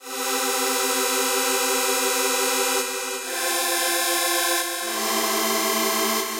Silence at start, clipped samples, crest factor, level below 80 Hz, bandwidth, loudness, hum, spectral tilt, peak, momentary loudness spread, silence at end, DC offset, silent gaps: 0 s; under 0.1%; 14 dB; -80 dBFS; 16.5 kHz; -21 LUFS; none; 0.5 dB/octave; -10 dBFS; 4 LU; 0 s; under 0.1%; none